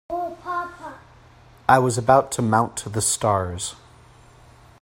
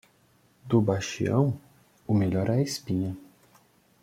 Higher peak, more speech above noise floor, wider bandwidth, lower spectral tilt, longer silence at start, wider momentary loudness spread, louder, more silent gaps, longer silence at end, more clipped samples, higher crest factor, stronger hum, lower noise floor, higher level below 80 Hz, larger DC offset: first, 0 dBFS vs -8 dBFS; second, 30 dB vs 38 dB; about the same, 16.5 kHz vs 16 kHz; second, -4.5 dB/octave vs -6.5 dB/octave; second, 0.1 s vs 0.65 s; about the same, 14 LU vs 12 LU; first, -21 LUFS vs -27 LUFS; neither; first, 1.1 s vs 0.8 s; neither; about the same, 22 dB vs 20 dB; neither; second, -50 dBFS vs -63 dBFS; first, -52 dBFS vs -60 dBFS; neither